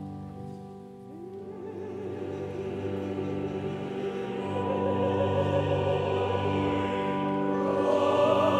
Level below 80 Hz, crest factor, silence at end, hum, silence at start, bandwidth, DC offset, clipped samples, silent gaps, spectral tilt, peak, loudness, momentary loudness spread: -58 dBFS; 16 dB; 0 s; none; 0 s; 10.5 kHz; under 0.1%; under 0.1%; none; -7.5 dB/octave; -12 dBFS; -29 LUFS; 16 LU